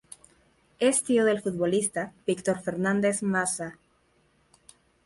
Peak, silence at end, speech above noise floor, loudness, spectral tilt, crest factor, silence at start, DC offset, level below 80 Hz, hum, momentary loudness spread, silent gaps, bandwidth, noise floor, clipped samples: -12 dBFS; 1.35 s; 40 dB; -26 LUFS; -4.5 dB/octave; 16 dB; 0.8 s; under 0.1%; -66 dBFS; none; 7 LU; none; 11.5 kHz; -66 dBFS; under 0.1%